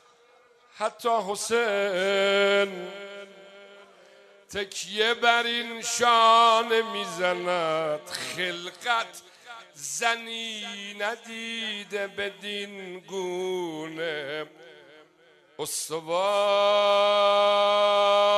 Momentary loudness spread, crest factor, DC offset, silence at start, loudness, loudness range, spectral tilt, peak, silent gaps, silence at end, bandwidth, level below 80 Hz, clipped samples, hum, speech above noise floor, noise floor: 16 LU; 22 dB; under 0.1%; 0.75 s; -25 LUFS; 10 LU; -2 dB/octave; -4 dBFS; none; 0 s; 14 kHz; -74 dBFS; under 0.1%; none; 33 dB; -59 dBFS